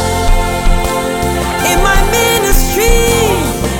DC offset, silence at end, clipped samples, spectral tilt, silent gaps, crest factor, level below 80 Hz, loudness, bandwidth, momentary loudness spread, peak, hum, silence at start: under 0.1%; 0 s; under 0.1%; -3.5 dB/octave; none; 10 dB; -14 dBFS; -12 LUFS; 17.5 kHz; 5 LU; 0 dBFS; none; 0 s